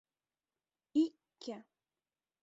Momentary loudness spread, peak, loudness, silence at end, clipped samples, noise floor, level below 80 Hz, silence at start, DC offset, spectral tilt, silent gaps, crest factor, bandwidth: 16 LU; -22 dBFS; -37 LUFS; 0.8 s; under 0.1%; under -90 dBFS; -86 dBFS; 0.95 s; under 0.1%; -4.5 dB/octave; none; 20 dB; 7.8 kHz